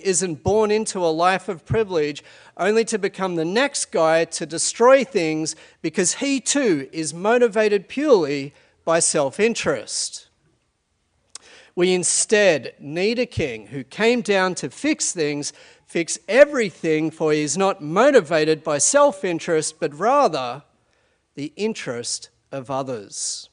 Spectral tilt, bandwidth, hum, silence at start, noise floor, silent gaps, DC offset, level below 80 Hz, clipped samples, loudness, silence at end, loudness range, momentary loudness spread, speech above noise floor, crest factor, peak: -3.5 dB/octave; 10.5 kHz; none; 0.05 s; -69 dBFS; none; under 0.1%; -58 dBFS; under 0.1%; -20 LUFS; 0.1 s; 5 LU; 13 LU; 49 dB; 20 dB; 0 dBFS